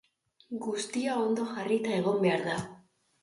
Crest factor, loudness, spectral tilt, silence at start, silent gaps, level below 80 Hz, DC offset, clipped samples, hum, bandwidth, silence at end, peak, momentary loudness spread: 16 dB; -30 LUFS; -5 dB/octave; 0.5 s; none; -70 dBFS; under 0.1%; under 0.1%; none; 11.5 kHz; 0.45 s; -14 dBFS; 10 LU